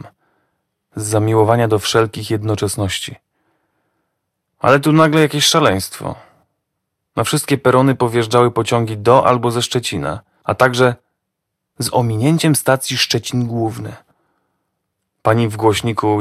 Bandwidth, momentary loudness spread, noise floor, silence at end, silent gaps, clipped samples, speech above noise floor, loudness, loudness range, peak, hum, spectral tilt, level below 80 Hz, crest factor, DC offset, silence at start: 15.5 kHz; 13 LU; -76 dBFS; 0 s; none; 0.1%; 61 dB; -15 LUFS; 4 LU; 0 dBFS; none; -5 dB/octave; -50 dBFS; 16 dB; under 0.1%; 0.05 s